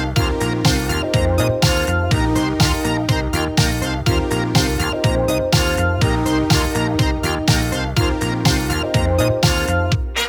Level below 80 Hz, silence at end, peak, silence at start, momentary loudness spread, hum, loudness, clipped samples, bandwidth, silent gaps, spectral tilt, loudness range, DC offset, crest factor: -26 dBFS; 0 s; -2 dBFS; 0 s; 3 LU; none; -18 LUFS; under 0.1%; over 20 kHz; none; -5 dB/octave; 0 LU; under 0.1%; 16 dB